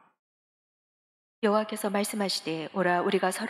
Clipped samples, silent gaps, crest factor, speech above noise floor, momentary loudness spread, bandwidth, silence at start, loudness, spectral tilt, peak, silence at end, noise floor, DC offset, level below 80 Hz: under 0.1%; none; 18 dB; over 62 dB; 5 LU; 15 kHz; 1.4 s; -28 LUFS; -4 dB/octave; -12 dBFS; 0 s; under -90 dBFS; under 0.1%; -84 dBFS